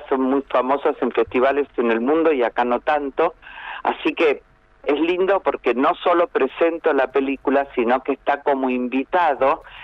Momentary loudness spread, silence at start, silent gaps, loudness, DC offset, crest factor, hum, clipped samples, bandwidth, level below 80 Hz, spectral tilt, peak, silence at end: 4 LU; 0 s; none; -20 LUFS; under 0.1%; 14 dB; none; under 0.1%; 6.2 kHz; -54 dBFS; -6.5 dB/octave; -6 dBFS; 0 s